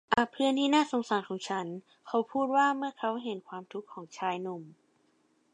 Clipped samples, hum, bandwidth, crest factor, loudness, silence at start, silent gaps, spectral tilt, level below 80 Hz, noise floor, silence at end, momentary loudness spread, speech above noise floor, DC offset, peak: under 0.1%; none; 11 kHz; 22 dB; -31 LUFS; 0.1 s; none; -4.5 dB/octave; -72 dBFS; -70 dBFS; 0.85 s; 16 LU; 39 dB; under 0.1%; -8 dBFS